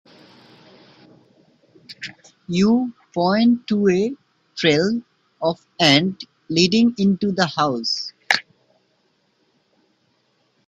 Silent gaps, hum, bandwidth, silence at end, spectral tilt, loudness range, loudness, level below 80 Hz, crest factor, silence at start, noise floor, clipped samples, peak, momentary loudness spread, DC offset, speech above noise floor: none; none; 9.8 kHz; 2.25 s; -5 dB/octave; 6 LU; -19 LUFS; -60 dBFS; 22 dB; 1.9 s; -65 dBFS; under 0.1%; 0 dBFS; 16 LU; under 0.1%; 46 dB